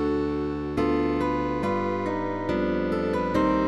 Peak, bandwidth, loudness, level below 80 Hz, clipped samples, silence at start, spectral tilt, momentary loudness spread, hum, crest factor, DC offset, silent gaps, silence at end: -12 dBFS; 11.5 kHz; -26 LUFS; -44 dBFS; under 0.1%; 0 s; -7.5 dB/octave; 4 LU; none; 12 dB; under 0.1%; none; 0 s